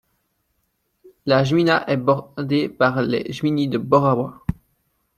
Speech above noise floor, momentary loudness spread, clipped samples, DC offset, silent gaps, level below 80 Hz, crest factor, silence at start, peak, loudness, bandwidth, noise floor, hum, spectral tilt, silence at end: 51 dB; 8 LU; under 0.1%; under 0.1%; none; -50 dBFS; 20 dB; 1.25 s; -2 dBFS; -20 LUFS; 13.5 kHz; -70 dBFS; none; -7 dB/octave; 0.65 s